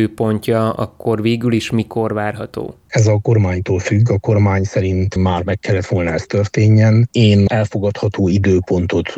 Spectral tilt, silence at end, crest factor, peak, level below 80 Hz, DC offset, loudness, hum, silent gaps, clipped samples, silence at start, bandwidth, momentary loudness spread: -7 dB/octave; 0 s; 12 dB; -2 dBFS; -42 dBFS; under 0.1%; -16 LUFS; none; none; under 0.1%; 0 s; 11 kHz; 8 LU